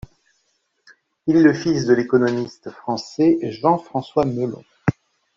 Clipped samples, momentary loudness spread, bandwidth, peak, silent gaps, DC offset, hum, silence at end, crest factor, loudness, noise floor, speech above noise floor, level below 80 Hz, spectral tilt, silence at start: under 0.1%; 12 LU; 7.6 kHz; -2 dBFS; none; under 0.1%; none; 0.45 s; 18 dB; -20 LUFS; -68 dBFS; 50 dB; -54 dBFS; -7 dB/octave; 1.25 s